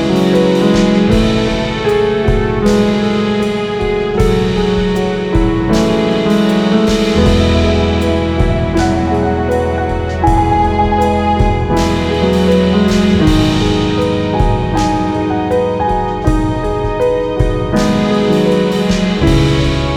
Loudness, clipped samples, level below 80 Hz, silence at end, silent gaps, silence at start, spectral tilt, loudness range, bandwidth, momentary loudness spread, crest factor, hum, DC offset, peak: -13 LUFS; under 0.1%; -22 dBFS; 0 s; none; 0 s; -6.5 dB/octave; 2 LU; 14 kHz; 4 LU; 12 dB; none; under 0.1%; 0 dBFS